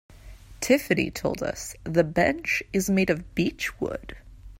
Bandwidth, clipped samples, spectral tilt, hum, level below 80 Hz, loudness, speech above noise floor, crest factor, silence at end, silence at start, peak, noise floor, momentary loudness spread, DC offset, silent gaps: 16 kHz; under 0.1%; -5 dB/octave; none; -46 dBFS; -26 LUFS; 20 dB; 20 dB; 0.05 s; 0.1 s; -8 dBFS; -46 dBFS; 11 LU; under 0.1%; none